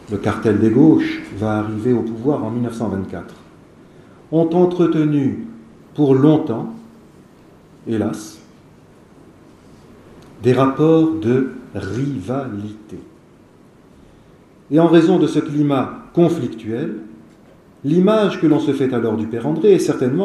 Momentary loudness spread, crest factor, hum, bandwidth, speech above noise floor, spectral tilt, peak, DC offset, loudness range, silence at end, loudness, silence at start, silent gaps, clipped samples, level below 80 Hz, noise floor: 17 LU; 18 dB; none; 12 kHz; 31 dB; -8 dB/octave; 0 dBFS; under 0.1%; 8 LU; 0 s; -17 LUFS; 0.1 s; none; under 0.1%; -54 dBFS; -47 dBFS